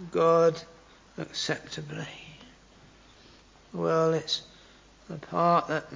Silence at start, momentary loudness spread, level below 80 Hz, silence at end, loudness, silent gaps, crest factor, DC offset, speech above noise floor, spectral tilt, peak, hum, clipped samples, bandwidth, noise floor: 0 s; 20 LU; -62 dBFS; 0 s; -27 LUFS; none; 18 dB; under 0.1%; 28 dB; -5 dB/octave; -12 dBFS; none; under 0.1%; 7.6 kHz; -55 dBFS